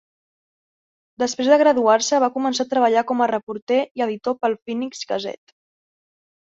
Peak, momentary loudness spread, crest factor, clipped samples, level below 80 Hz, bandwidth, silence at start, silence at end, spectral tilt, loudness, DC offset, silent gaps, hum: -2 dBFS; 11 LU; 18 dB; under 0.1%; -70 dBFS; 8 kHz; 1.2 s; 1.25 s; -3 dB/octave; -20 LUFS; under 0.1%; 3.43-3.47 s, 3.62-3.67 s, 3.91-3.95 s; none